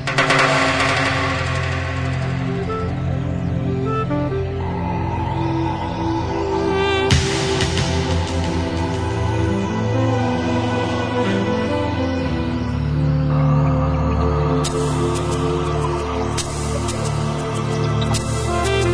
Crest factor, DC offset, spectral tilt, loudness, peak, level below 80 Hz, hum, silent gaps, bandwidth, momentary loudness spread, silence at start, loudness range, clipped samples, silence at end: 18 dB; under 0.1%; -5.5 dB/octave; -20 LUFS; -2 dBFS; -30 dBFS; none; none; 11 kHz; 6 LU; 0 s; 3 LU; under 0.1%; 0 s